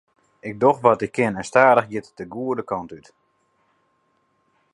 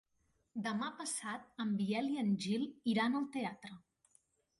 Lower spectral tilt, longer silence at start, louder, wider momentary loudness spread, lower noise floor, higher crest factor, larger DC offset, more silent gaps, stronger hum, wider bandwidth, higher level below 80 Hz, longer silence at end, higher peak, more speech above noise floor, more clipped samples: first, -6 dB/octave vs -4.5 dB/octave; about the same, 0.45 s vs 0.55 s; first, -20 LUFS vs -38 LUFS; first, 19 LU vs 10 LU; second, -67 dBFS vs -79 dBFS; first, 22 dB vs 16 dB; neither; neither; neither; about the same, 11.5 kHz vs 11.5 kHz; first, -62 dBFS vs -80 dBFS; first, 1.75 s vs 0.8 s; first, 0 dBFS vs -22 dBFS; first, 47 dB vs 41 dB; neither